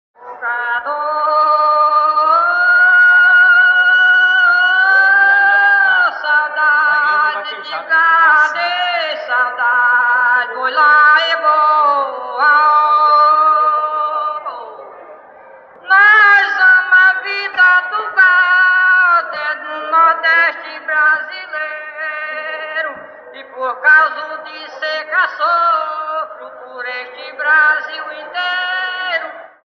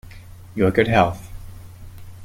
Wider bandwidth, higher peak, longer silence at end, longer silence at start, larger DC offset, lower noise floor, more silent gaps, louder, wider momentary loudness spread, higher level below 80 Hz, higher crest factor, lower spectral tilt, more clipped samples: second, 6.6 kHz vs 16.5 kHz; about the same, -2 dBFS vs -2 dBFS; first, 0.25 s vs 0 s; first, 0.2 s vs 0.05 s; neither; about the same, -40 dBFS vs -40 dBFS; neither; first, -11 LUFS vs -19 LUFS; second, 15 LU vs 25 LU; second, -76 dBFS vs -40 dBFS; second, 12 dB vs 20 dB; second, -1 dB/octave vs -7 dB/octave; neither